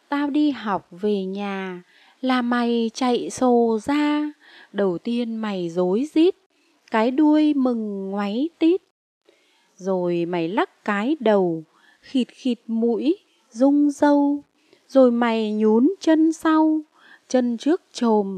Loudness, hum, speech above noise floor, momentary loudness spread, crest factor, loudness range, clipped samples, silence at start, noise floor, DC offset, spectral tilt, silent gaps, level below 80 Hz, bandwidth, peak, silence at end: -21 LUFS; none; 39 dB; 9 LU; 18 dB; 5 LU; under 0.1%; 0.1 s; -60 dBFS; under 0.1%; -6 dB/octave; 6.46-6.50 s, 8.91-9.21 s; -70 dBFS; 9.8 kHz; -4 dBFS; 0 s